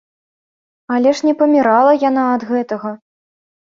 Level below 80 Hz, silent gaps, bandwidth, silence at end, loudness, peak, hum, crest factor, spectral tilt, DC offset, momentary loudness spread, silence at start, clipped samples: -64 dBFS; none; 7.6 kHz; 0.8 s; -14 LUFS; -2 dBFS; none; 14 dB; -5.5 dB/octave; under 0.1%; 11 LU; 0.9 s; under 0.1%